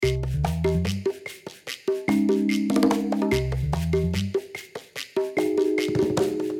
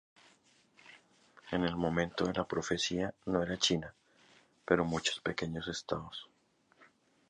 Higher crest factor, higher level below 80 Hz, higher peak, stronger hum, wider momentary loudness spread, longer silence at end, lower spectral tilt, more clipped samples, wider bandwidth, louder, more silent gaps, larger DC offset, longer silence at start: second, 16 dB vs 24 dB; first, -38 dBFS vs -60 dBFS; first, -8 dBFS vs -12 dBFS; neither; first, 14 LU vs 9 LU; second, 0 s vs 0.45 s; first, -6.5 dB/octave vs -4 dB/octave; neither; first, 17 kHz vs 10 kHz; first, -24 LUFS vs -34 LUFS; neither; neither; second, 0 s vs 0.85 s